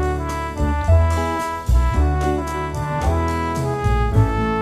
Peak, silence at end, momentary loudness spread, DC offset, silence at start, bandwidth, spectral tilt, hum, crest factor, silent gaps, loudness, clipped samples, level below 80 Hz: -4 dBFS; 0 s; 7 LU; under 0.1%; 0 s; 14 kHz; -7 dB/octave; none; 14 dB; none; -20 LUFS; under 0.1%; -22 dBFS